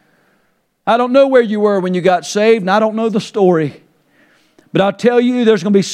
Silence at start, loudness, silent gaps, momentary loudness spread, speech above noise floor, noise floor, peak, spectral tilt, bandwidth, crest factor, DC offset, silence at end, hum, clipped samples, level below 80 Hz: 0.85 s; -13 LUFS; none; 6 LU; 48 dB; -61 dBFS; 0 dBFS; -6 dB/octave; 11.5 kHz; 14 dB; under 0.1%; 0 s; none; under 0.1%; -62 dBFS